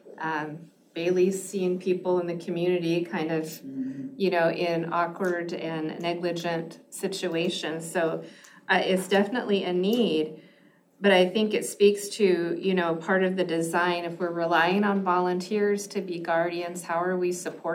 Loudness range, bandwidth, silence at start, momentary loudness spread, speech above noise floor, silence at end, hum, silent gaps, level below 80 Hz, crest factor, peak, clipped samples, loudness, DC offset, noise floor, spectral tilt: 4 LU; 16.5 kHz; 0.05 s; 10 LU; 33 dB; 0 s; none; none; -82 dBFS; 18 dB; -8 dBFS; under 0.1%; -26 LUFS; under 0.1%; -59 dBFS; -5 dB/octave